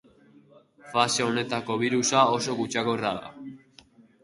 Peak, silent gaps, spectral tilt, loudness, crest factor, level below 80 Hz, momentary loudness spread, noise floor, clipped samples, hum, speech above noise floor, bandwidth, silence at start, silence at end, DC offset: -6 dBFS; none; -3.5 dB/octave; -25 LUFS; 22 dB; -66 dBFS; 16 LU; -56 dBFS; under 0.1%; none; 31 dB; 11.5 kHz; 0.85 s; 0.65 s; under 0.1%